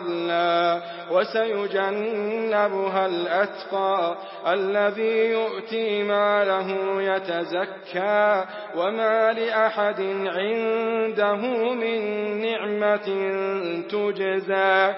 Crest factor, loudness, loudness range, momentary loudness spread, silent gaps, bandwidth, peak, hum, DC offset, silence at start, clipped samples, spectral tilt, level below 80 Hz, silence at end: 16 dB; -24 LUFS; 1 LU; 6 LU; none; 5.8 kHz; -6 dBFS; none; under 0.1%; 0 s; under 0.1%; -9 dB/octave; -88 dBFS; 0 s